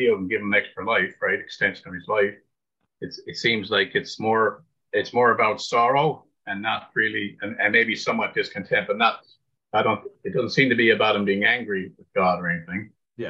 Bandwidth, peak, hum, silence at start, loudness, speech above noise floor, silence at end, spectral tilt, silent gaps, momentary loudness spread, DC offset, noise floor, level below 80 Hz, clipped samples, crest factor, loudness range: 8 kHz; -4 dBFS; none; 0 s; -22 LUFS; 56 dB; 0 s; -5 dB/octave; none; 11 LU; under 0.1%; -79 dBFS; -68 dBFS; under 0.1%; 20 dB; 3 LU